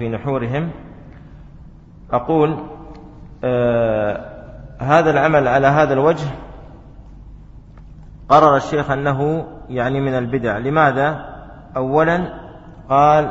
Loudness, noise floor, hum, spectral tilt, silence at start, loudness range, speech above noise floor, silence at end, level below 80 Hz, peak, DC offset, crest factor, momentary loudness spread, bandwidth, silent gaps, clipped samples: -17 LUFS; -40 dBFS; none; -7.5 dB/octave; 0 s; 5 LU; 24 dB; 0 s; -40 dBFS; 0 dBFS; under 0.1%; 18 dB; 22 LU; 8 kHz; none; under 0.1%